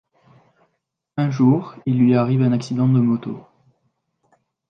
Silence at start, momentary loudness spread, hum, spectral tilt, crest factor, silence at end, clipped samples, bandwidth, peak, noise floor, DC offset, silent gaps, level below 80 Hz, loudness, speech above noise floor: 1.15 s; 12 LU; none; -9 dB/octave; 16 dB; 1.3 s; under 0.1%; 7 kHz; -4 dBFS; -75 dBFS; under 0.1%; none; -64 dBFS; -18 LUFS; 57 dB